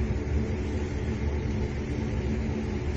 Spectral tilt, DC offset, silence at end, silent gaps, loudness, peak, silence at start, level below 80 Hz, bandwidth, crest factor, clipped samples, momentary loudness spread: -7.5 dB/octave; under 0.1%; 0 s; none; -30 LUFS; -16 dBFS; 0 s; -32 dBFS; 7.8 kHz; 12 dB; under 0.1%; 2 LU